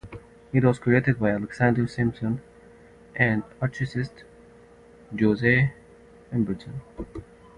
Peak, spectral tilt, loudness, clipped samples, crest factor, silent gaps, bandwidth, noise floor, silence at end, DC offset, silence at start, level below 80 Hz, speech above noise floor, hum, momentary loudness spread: -4 dBFS; -8.5 dB/octave; -25 LUFS; under 0.1%; 22 dB; none; 9.8 kHz; -51 dBFS; 0.35 s; under 0.1%; 0.05 s; -52 dBFS; 27 dB; none; 18 LU